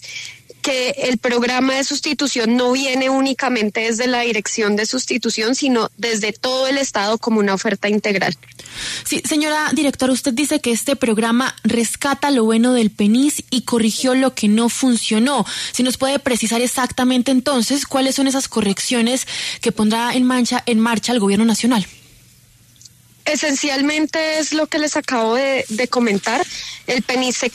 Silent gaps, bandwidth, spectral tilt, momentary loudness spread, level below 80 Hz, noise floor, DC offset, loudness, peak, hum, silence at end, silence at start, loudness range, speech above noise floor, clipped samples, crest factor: none; 13.5 kHz; -3 dB/octave; 5 LU; -56 dBFS; -49 dBFS; under 0.1%; -17 LUFS; -4 dBFS; none; 0.05 s; 0 s; 2 LU; 32 dB; under 0.1%; 12 dB